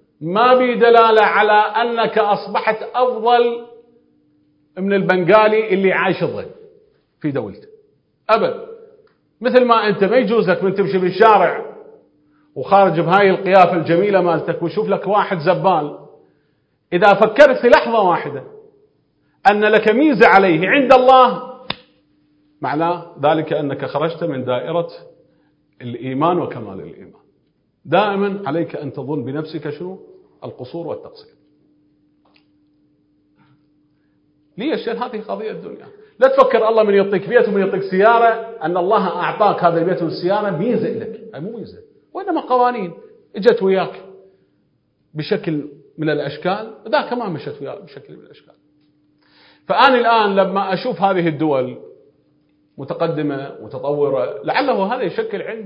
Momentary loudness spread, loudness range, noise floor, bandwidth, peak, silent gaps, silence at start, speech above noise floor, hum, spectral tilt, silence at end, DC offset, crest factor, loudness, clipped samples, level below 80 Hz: 18 LU; 11 LU; -63 dBFS; 8 kHz; 0 dBFS; none; 0.2 s; 47 dB; none; -7.5 dB/octave; 0 s; under 0.1%; 18 dB; -16 LUFS; under 0.1%; -60 dBFS